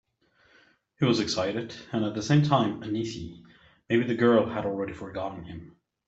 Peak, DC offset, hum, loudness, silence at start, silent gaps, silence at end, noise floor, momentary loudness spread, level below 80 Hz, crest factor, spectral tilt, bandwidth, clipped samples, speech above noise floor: -8 dBFS; under 0.1%; none; -27 LUFS; 1 s; none; 0.4 s; -65 dBFS; 16 LU; -60 dBFS; 20 dB; -6 dB/octave; 8 kHz; under 0.1%; 38 dB